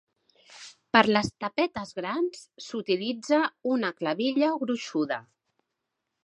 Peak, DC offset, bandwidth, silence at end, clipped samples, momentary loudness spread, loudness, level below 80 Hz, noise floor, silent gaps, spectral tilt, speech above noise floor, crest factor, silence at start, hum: -2 dBFS; under 0.1%; 11.5 kHz; 1.05 s; under 0.1%; 13 LU; -27 LUFS; -64 dBFS; -83 dBFS; none; -4.5 dB/octave; 56 dB; 26 dB; 0.5 s; none